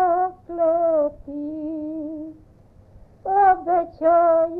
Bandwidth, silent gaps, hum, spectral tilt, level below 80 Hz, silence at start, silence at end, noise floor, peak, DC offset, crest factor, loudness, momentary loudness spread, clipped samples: 2.9 kHz; none; none; -9.5 dB/octave; -52 dBFS; 0 s; 0 s; -50 dBFS; -6 dBFS; under 0.1%; 16 dB; -21 LUFS; 16 LU; under 0.1%